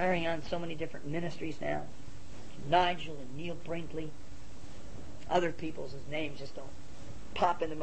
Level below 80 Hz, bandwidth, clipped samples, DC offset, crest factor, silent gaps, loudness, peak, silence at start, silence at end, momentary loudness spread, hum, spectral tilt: -54 dBFS; 8.4 kHz; under 0.1%; 2%; 22 dB; none; -35 LUFS; -14 dBFS; 0 s; 0 s; 20 LU; none; -5.5 dB/octave